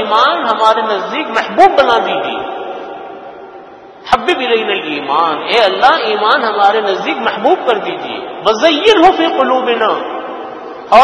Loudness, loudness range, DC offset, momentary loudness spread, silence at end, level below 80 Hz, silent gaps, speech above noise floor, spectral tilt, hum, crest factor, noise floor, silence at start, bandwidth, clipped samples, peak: -12 LUFS; 4 LU; under 0.1%; 17 LU; 0 s; -48 dBFS; none; 22 dB; -3.5 dB/octave; none; 12 dB; -34 dBFS; 0 s; 12 kHz; 0.6%; 0 dBFS